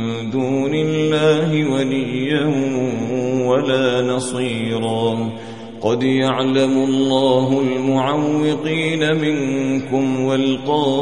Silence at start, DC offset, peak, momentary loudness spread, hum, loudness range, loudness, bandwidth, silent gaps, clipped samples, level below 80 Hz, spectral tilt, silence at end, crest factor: 0 s; 0.6%; -2 dBFS; 5 LU; none; 2 LU; -18 LUFS; 11 kHz; none; under 0.1%; -56 dBFS; -6 dB/octave; 0 s; 14 dB